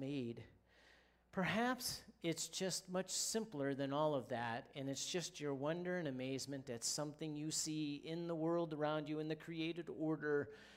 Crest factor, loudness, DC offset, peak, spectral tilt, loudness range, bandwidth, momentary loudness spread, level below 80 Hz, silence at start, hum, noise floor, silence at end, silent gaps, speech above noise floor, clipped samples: 16 dB; -42 LUFS; under 0.1%; -26 dBFS; -4 dB/octave; 2 LU; 16 kHz; 6 LU; -76 dBFS; 0 s; none; -70 dBFS; 0 s; none; 28 dB; under 0.1%